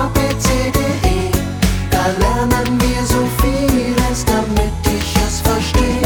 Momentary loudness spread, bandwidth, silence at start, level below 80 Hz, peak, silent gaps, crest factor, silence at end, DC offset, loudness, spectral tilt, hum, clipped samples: 3 LU; over 20 kHz; 0 s; -20 dBFS; 0 dBFS; none; 14 dB; 0 s; under 0.1%; -16 LUFS; -5 dB/octave; none; under 0.1%